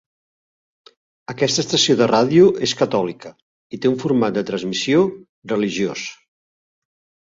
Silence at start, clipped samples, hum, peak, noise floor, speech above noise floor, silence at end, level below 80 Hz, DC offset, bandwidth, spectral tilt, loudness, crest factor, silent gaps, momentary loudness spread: 1.3 s; under 0.1%; none; -2 dBFS; under -90 dBFS; over 72 dB; 1.05 s; -60 dBFS; under 0.1%; 7.8 kHz; -4.5 dB/octave; -18 LUFS; 18 dB; 3.42-3.70 s, 5.29-5.42 s; 18 LU